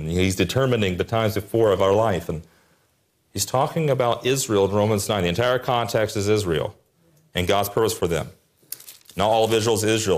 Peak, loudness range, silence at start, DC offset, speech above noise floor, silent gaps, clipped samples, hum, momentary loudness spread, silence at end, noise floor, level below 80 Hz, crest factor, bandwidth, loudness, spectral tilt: -8 dBFS; 3 LU; 0 s; under 0.1%; 45 dB; none; under 0.1%; none; 13 LU; 0 s; -66 dBFS; -52 dBFS; 14 dB; 15.5 kHz; -22 LUFS; -4.5 dB/octave